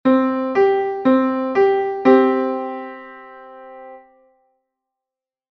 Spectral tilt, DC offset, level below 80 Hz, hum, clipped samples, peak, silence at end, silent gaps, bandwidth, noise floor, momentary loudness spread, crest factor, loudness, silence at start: -7 dB/octave; under 0.1%; -64 dBFS; none; under 0.1%; -2 dBFS; 1.55 s; none; 6.2 kHz; -88 dBFS; 24 LU; 18 dB; -17 LUFS; 0.05 s